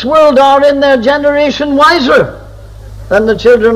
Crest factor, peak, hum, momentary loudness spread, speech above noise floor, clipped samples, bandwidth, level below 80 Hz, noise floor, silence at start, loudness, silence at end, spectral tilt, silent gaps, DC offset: 8 dB; 0 dBFS; none; 6 LU; 22 dB; 0.1%; 14.5 kHz; -34 dBFS; -29 dBFS; 0 s; -8 LUFS; 0 s; -5 dB/octave; none; under 0.1%